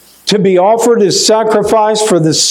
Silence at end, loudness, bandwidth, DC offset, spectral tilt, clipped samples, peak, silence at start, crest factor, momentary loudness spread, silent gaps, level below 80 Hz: 0 s; -9 LUFS; 17 kHz; under 0.1%; -3.5 dB/octave; under 0.1%; 0 dBFS; 0.25 s; 10 dB; 2 LU; none; -50 dBFS